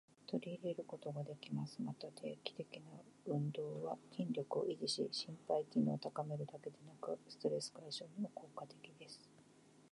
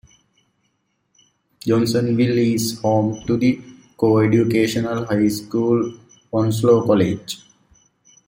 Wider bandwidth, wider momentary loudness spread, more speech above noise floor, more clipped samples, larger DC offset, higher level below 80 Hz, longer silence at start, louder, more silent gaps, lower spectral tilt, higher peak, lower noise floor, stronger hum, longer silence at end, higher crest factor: second, 11 kHz vs 16 kHz; first, 14 LU vs 10 LU; second, 23 dB vs 51 dB; neither; neither; second, under -90 dBFS vs -54 dBFS; second, 0.25 s vs 1.65 s; second, -44 LUFS vs -19 LUFS; neither; about the same, -6 dB/octave vs -6.5 dB/octave; second, -24 dBFS vs -2 dBFS; about the same, -67 dBFS vs -69 dBFS; neither; second, 0.05 s vs 0.9 s; about the same, 20 dB vs 18 dB